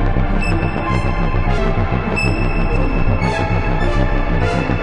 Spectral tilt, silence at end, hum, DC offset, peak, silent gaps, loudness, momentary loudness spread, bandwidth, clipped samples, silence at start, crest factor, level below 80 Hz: -7 dB/octave; 0 s; none; under 0.1%; -4 dBFS; none; -18 LUFS; 1 LU; 11 kHz; under 0.1%; 0 s; 12 dB; -18 dBFS